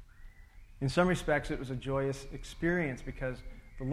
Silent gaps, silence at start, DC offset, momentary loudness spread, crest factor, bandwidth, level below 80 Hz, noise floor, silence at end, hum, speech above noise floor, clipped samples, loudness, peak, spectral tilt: none; 0 s; under 0.1%; 13 LU; 20 dB; 14 kHz; -46 dBFS; -53 dBFS; 0 s; none; 20 dB; under 0.1%; -33 LUFS; -14 dBFS; -6 dB/octave